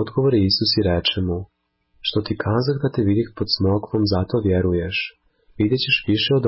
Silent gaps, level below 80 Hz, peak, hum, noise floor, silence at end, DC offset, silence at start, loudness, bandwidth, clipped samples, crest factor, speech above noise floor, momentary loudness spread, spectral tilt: none; -38 dBFS; -6 dBFS; none; -62 dBFS; 0 s; under 0.1%; 0 s; -20 LUFS; 5.8 kHz; under 0.1%; 14 dB; 42 dB; 7 LU; -9.5 dB/octave